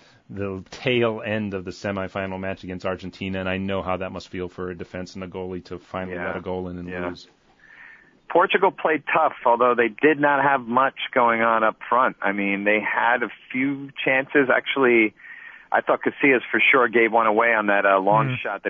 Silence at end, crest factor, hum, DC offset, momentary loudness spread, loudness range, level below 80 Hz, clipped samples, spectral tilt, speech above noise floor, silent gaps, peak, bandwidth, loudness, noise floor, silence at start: 0 s; 16 dB; none; under 0.1%; 14 LU; 11 LU; -60 dBFS; under 0.1%; -6.5 dB/octave; 27 dB; none; -6 dBFS; 7.6 kHz; -21 LUFS; -49 dBFS; 0.3 s